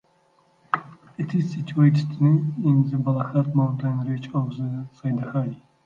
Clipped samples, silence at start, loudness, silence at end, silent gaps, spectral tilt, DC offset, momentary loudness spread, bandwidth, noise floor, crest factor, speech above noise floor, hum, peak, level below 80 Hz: under 0.1%; 0.75 s; -24 LUFS; 0.3 s; none; -9.5 dB/octave; under 0.1%; 11 LU; 7 kHz; -62 dBFS; 20 dB; 40 dB; none; -4 dBFS; -66 dBFS